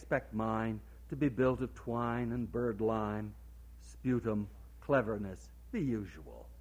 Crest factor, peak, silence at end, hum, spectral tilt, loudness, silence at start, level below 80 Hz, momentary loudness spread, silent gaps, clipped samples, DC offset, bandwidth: 20 dB; -16 dBFS; 0 s; none; -8.5 dB/octave; -36 LUFS; 0 s; -52 dBFS; 19 LU; none; under 0.1%; under 0.1%; 16 kHz